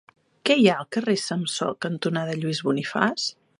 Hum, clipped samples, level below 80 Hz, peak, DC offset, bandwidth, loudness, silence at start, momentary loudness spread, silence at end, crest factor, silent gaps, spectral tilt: none; under 0.1%; -72 dBFS; -2 dBFS; under 0.1%; 11.5 kHz; -24 LUFS; 0.45 s; 9 LU; 0.25 s; 22 dB; none; -4.5 dB/octave